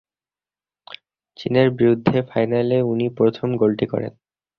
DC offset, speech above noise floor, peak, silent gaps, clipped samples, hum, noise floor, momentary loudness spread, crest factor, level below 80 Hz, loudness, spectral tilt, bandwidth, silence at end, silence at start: under 0.1%; over 71 dB; -2 dBFS; none; under 0.1%; none; under -90 dBFS; 21 LU; 18 dB; -56 dBFS; -19 LUFS; -9.5 dB/octave; 6.2 kHz; 0.5 s; 0.9 s